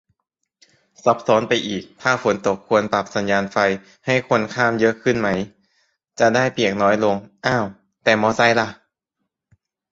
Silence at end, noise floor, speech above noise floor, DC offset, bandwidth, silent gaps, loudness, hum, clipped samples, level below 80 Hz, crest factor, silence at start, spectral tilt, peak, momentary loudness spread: 1.2 s; -78 dBFS; 59 dB; under 0.1%; 7.8 kHz; none; -19 LUFS; none; under 0.1%; -56 dBFS; 20 dB; 1.05 s; -5 dB/octave; -2 dBFS; 6 LU